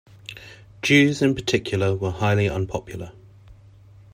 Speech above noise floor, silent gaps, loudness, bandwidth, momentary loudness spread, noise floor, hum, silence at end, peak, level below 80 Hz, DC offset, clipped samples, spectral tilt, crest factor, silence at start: 27 dB; none; -21 LUFS; 15.5 kHz; 22 LU; -48 dBFS; none; 0.6 s; -4 dBFS; -50 dBFS; under 0.1%; under 0.1%; -5.5 dB/octave; 18 dB; 0.3 s